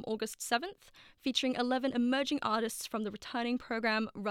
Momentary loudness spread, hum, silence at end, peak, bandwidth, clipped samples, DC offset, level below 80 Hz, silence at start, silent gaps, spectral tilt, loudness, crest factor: 7 LU; none; 0 s; -16 dBFS; 16.5 kHz; under 0.1%; under 0.1%; -68 dBFS; 0 s; none; -3 dB/octave; -33 LUFS; 18 dB